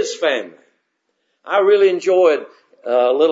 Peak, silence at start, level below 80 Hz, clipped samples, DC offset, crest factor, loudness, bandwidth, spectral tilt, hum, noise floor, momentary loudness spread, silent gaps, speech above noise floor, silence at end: -2 dBFS; 0 s; -82 dBFS; under 0.1%; under 0.1%; 14 dB; -16 LUFS; 7.8 kHz; -3 dB/octave; none; -70 dBFS; 11 LU; none; 55 dB; 0 s